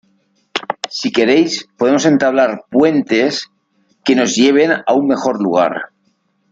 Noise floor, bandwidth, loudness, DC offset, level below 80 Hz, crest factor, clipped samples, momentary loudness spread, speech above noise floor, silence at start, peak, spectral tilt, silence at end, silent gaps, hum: -62 dBFS; 7.8 kHz; -14 LUFS; under 0.1%; -60 dBFS; 14 dB; under 0.1%; 12 LU; 49 dB; 0.55 s; 0 dBFS; -4 dB/octave; 0.65 s; none; none